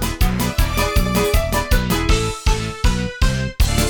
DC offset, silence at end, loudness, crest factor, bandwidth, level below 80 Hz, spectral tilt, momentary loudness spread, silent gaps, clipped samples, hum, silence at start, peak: under 0.1%; 0 s; -19 LUFS; 14 dB; over 20 kHz; -20 dBFS; -4.5 dB/octave; 3 LU; none; under 0.1%; none; 0 s; -4 dBFS